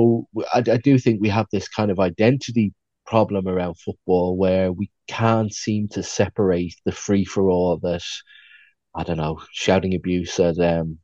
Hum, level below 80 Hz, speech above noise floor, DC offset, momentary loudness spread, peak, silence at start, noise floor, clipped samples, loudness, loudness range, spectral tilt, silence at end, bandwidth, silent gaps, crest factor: none; -50 dBFS; 32 dB; under 0.1%; 9 LU; -2 dBFS; 0 s; -52 dBFS; under 0.1%; -21 LUFS; 3 LU; -6.5 dB/octave; 0.1 s; 8 kHz; none; 18 dB